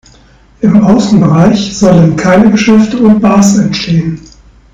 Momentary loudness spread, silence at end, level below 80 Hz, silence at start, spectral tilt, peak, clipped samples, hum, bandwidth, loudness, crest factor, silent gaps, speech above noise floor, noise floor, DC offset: 6 LU; 0.55 s; -34 dBFS; 0.6 s; -6.5 dB/octave; 0 dBFS; 7%; none; 9 kHz; -7 LUFS; 8 dB; none; 35 dB; -41 dBFS; under 0.1%